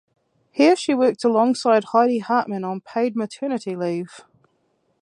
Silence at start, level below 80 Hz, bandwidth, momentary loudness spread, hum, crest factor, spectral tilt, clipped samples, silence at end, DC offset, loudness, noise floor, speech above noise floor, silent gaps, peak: 0.55 s; -76 dBFS; 11 kHz; 10 LU; none; 18 dB; -5.5 dB/octave; under 0.1%; 0.8 s; under 0.1%; -20 LUFS; -67 dBFS; 47 dB; none; -4 dBFS